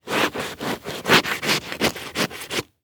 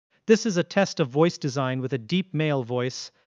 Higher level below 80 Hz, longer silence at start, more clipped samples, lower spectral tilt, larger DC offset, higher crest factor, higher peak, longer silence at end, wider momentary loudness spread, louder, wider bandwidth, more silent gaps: first, -54 dBFS vs -74 dBFS; second, 0.05 s vs 0.3 s; neither; second, -2.5 dB/octave vs -5.5 dB/octave; neither; about the same, 20 dB vs 18 dB; about the same, -4 dBFS vs -6 dBFS; about the same, 0.2 s vs 0.25 s; first, 11 LU vs 7 LU; first, -22 LUFS vs -25 LUFS; first, over 20 kHz vs 9.4 kHz; neither